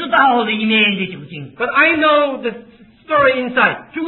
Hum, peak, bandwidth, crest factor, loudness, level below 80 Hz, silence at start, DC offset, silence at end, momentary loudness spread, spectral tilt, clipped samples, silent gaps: none; 0 dBFS; 4.3 kHz; 16 dB; -14 LUFS; -54 dBFS; 0 s; under 0.1%; 0 s; 13 LU; -8 dB/octave; under 0.1%; none